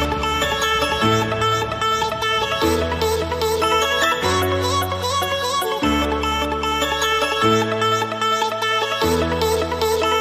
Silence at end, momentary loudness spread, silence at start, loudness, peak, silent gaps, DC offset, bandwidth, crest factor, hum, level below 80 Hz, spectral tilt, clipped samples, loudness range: 0 s; 3 LU; 0 s; -19 LUFS; -4 dBFS; none; under 0.1%; 15.5 kHz; 14 dB; none; -36 dBFS; -3.5 dB/octave; under 0.1%; 1 LU